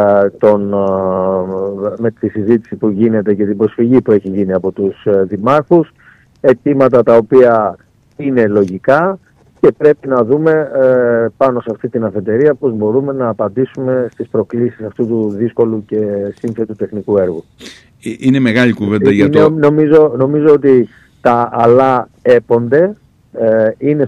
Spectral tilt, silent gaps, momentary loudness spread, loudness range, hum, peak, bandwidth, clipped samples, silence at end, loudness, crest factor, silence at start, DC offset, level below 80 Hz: -8.5 dB/octave; none; 9 LU; 6 LU; none; 0 dBFS; 9.2 kHz; under 0.1%; 0 s; -12 LUFS; 12 dB; 0 s; under 0.1%; -52 dBFS